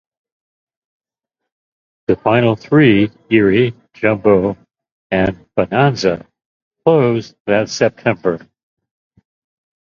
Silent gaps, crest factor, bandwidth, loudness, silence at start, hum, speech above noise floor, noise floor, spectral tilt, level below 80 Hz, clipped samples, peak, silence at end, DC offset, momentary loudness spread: 4.92-5.10 s, 6.46-6.71 s, 7.40-7.45 s; 16 dB; 7.4 kHz; -15 LUFS; 2.1 s; none; 67 dB; -81 dBFS; -6.5 dB/octave; -46 dBFS; under 0.1%; 0 dBFS; 1.45 s; under 0.1%; 9 LU